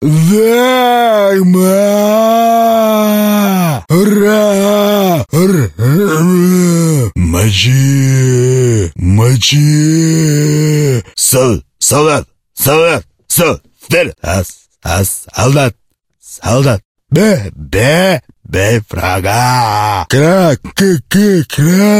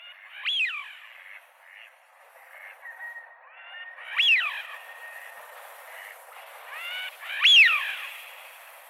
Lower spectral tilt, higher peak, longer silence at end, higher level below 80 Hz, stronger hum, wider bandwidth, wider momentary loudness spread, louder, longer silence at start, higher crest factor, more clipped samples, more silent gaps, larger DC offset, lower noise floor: first, -5 dB/octave vs 8 dB/octave; first, 0 dBFS vs -8 dBFS; about the same, 0 s vs 0.1 s; first, -34 dBFS vs under -90 dBFS; neither; about the same, 16 kHz vs 16.5 kHz; second, 6 LU vs 27 LU; first, -10 LUFS vs -21 LUFS; about the same, 0 s vs 0 s; second, 10 dB vs 20 dB; neither; first, 16.85-16.95 s vs none; neither; second, -42 dBFS vs -55 dBFS